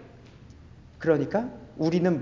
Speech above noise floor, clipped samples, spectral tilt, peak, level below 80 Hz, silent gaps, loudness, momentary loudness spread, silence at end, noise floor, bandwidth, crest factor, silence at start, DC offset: 24 dB; under 0.1%; -8 dB/octave; -8 dBFS; -54 dBFS; none; -27 LUFS; 7 LU; 0 s; -49 dBFS; 7.4 kHz; 20 dB; 0 s; under 0.1%